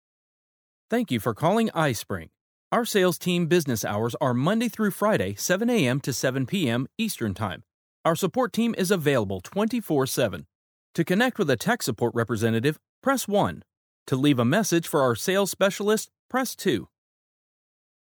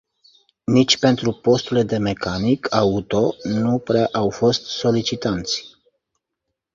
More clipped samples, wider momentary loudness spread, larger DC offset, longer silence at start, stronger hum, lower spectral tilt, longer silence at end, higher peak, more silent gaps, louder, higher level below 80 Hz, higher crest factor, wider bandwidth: neither; about the same, 7 LU vs 7 LU; neither; first, 0.9 s vs 0.7 s; neither; about the same, -5 dB/octave vs -5.5 dB/octave; first, 1.2 s vs 1.05 s; second, -6 dBFS vs -2 dBFS; first, 2.41-2.71 s, 7.74-8.04 s, 10.55-10.94 s, 12.89-13.02 s, 13.77-14.06 s, 16.19-16.29 s vs none; second, -25 LUFS vs -19 LUFS; second, -64 dBFS vs -48 dBFS; about the same, 18 dB vs 18 dB; first, over 20 kHz vs 7.6 kHz